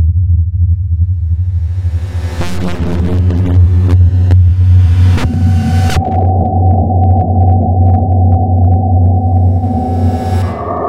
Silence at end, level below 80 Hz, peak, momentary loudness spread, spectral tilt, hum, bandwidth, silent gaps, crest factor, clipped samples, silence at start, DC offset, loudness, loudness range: 0 s; -20 dBFS; 0 dBFS; 8 LU; -8.5 dB/octave; none; 7 kHz; none; 10 dB; under 0.1%; 0 s; under 0.1%; -11 LUFS; 4 LU